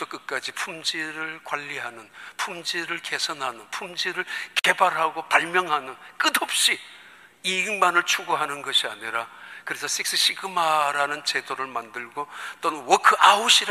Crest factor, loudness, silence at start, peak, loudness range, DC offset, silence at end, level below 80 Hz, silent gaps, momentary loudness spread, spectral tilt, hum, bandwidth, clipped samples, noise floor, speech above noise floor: 22 dB; -23 LUFS; 0 s; -2 dBFS; 7 LU; under 0.1%; 0 s; -78 dBFS; none; 14 LU; -0.5 dB/octave; none; 15 kHz; under 0.1%; -48 dBFS; 23 dB